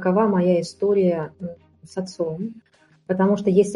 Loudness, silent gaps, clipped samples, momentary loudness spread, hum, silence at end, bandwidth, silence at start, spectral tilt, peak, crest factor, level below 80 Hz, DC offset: -22 LUFS; none; under 0.1%; 15 LU; none; 0 s; 11.5 kHz; 0 s; -7.5 dB/octave; -6 dBFS; 16 dB; -62 dBFS; under 0.1%